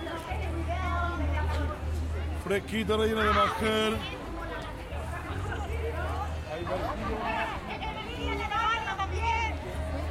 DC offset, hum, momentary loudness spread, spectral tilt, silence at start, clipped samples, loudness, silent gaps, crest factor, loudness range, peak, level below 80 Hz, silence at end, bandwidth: under 0.1%; none; 10 LU; -5.5 dB/octave; 0 s; under 0.1%; -31 LUFS; none; 18 dB; 5 LU; -14 dBFS; -38 dBFS; 0 s; 14 kHz